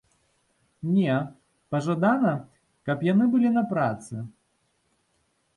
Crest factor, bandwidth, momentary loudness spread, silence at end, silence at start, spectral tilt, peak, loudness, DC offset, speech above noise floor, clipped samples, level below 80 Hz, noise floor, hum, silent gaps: 18 dB; 11.5 kHz; 16 LU; 1.3 s; 0.85 s; -8 dB/octave; -8 dBFS; -25 LUFS; under 0.1%; 47 dB; under 0.1%; -68 dBFS; -71 dBFS; none; none